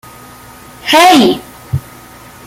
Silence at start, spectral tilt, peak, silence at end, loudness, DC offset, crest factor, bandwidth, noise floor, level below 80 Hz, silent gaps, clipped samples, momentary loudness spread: 0.85 s; -4 dB/octave; 0 dBFS; 0.65 s; -10 LUFS; under 0.1%; 12 dB; 17 kHz; -35 dBFS; -42 dBFS; none; under 0.1%; 16 LU